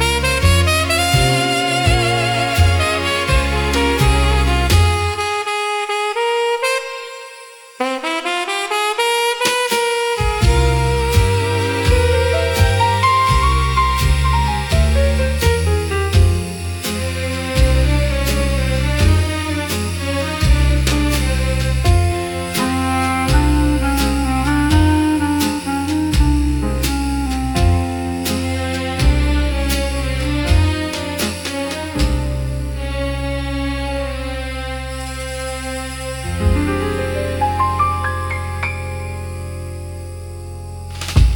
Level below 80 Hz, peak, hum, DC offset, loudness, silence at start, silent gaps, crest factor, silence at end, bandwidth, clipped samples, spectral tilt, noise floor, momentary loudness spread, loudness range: -22 dBFS; 0 dBFS; none; under 0.1%; -17 LUFS; 0 s; none; 16 dB; 0 s; 18 kHz; under 0.1%; -5 dB/octave; -38 dBFS; 10 LU; 7 LU